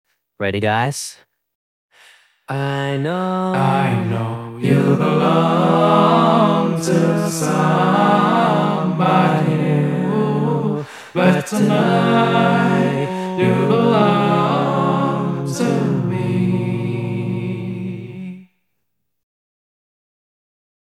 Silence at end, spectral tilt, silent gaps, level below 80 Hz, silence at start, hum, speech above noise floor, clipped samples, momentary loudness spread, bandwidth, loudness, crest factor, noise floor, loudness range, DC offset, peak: 2.45 s; -6.5 dB/octave; 1.55-1.89 s; -64 dBFS; 0.4 s; none; 61 dB; under 0.1%; 10 LU; 14.5 kHz; -17 LUFS; 16 dB; -76 dBFS; 8 LU; under 0.1%; 0 dBFS